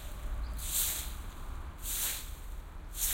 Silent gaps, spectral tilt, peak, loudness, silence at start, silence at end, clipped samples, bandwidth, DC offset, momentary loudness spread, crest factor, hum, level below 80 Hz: none; -1 dB/octave; -18 dBFS; -36 LUFS; 0 s; 0 s; under 0.1%; 16.5 kHz; under 0.1%; 15 LU; 20 dB; none; -40 dBFS